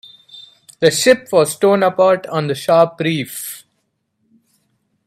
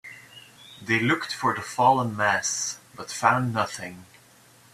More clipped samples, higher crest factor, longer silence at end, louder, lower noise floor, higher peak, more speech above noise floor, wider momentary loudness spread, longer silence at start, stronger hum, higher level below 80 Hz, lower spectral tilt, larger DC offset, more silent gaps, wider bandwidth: neither; about the same, 18 dB vs 22 dB; first, 1.5 s vs 0.7 s; first, -15 LUFS vs -24 LUFS; first, -69 dBFS vs -55 dBFS; first, 0 dBFS vs -4 dBFS; first, 54 dB vs 30 dB; second, 12 LU vs 19 LU; first, 0.35 s vs 0.05 s; neither; about the same, -62 dBFS vs -66 dBFS; about the same, -4 dB/octave vs -3.5 dB/octave; neither; neither; about the same, 16 kHz vs 15 kHz